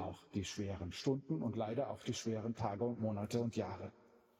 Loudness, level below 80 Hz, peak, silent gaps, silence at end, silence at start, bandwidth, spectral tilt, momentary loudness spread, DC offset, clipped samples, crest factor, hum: -41 LUFS; -72 dBFS; -22 dBFS; none; 0.5 s; 0 s; 14.5 kHz; -6 dB/octave; 5 LU; under 0.1%; under 0.1%; 18 dB; none